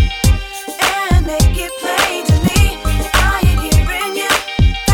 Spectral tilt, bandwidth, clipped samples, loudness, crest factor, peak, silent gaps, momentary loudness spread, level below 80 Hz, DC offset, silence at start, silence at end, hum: -4.5 dB/octave; 18.5 kHz; under 0.1%; -15 LUFS; 14 dB; 0 dBFS; none; 5 LU; -18 dBFS; under 0.1%; 0 s; 0 s; none